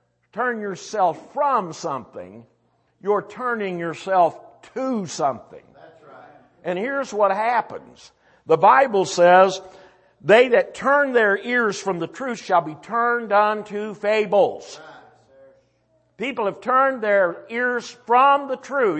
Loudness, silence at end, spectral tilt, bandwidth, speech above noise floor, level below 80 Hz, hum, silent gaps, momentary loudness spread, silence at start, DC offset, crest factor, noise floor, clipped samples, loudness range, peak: -20 LUFS; 0 s; -4.5 dB/octave; 8.6 kHz; 44 dB; -70 dBFS; none; none; 15 LU; 0.35 s; under 0.1%; 18 dB; -64 dBFS; under 0.1%; 8 LU; -2 dBFS